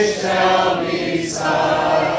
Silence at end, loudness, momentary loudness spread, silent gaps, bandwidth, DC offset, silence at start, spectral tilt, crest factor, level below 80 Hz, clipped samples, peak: 0 s; -17 LUFS; 5 LU; none; 8 kHz; under 0.1%; 0 s; -4 dB/octave; 14 dB; -48 dBFS; under 0.1%; -4 dBFS